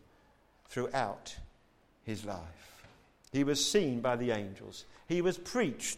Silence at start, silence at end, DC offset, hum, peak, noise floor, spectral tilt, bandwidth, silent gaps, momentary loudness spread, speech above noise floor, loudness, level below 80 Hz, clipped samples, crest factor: 0.7 s; 0 s; under 0.1%; none; -18 dBFS; -67 dBFS; -4 dB/octave; 16 kHz; none; 21 LU; 33 dB; -34 LUFS; -60 dBFS; under 0.1%; 18 dB